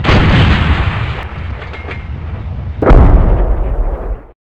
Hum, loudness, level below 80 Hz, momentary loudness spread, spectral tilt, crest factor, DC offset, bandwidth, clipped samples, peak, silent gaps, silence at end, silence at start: none; -13 LUFS; -14 dBFS; 15 LU; -7.5 dB/octave; 12 dB; under 0.1%; 7.2 kHz; 0.9%; 0 dBFS; none; 0.2 s; 0 s